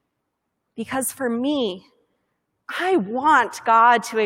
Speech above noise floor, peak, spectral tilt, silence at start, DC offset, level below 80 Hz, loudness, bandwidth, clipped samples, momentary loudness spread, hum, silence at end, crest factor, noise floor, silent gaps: 57 dB; -4 dBFS; -3.5 dB/octave; 0.75 s; under 0.1%; -66 dBFS; -20 LUFS; 16.5 kHz; under 0.1%; 14 LU; none; 0 s; 18 dB; -77 dBFS; none